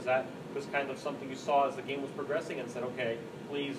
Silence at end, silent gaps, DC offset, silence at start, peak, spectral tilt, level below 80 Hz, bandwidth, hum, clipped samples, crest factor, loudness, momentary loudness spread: 0 s; none; under 0.1%; 0 s; -18 dBFS; -5 dB/octave; -74 dBFS; 15 kHz; none; under 0.1%; 18 dB; -35 LUFS; 10 LU